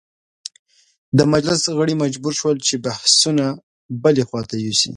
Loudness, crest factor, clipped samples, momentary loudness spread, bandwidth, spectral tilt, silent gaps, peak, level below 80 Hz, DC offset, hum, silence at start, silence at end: -17 LUFS; 20 dB; under 0.1%; 20 LU; 11.5 kHz; -4 dB/octave; 3.63-3.89 s; 0 dBFS; -56 dBFS; under 0.1%; none; 1.15 s; 0 s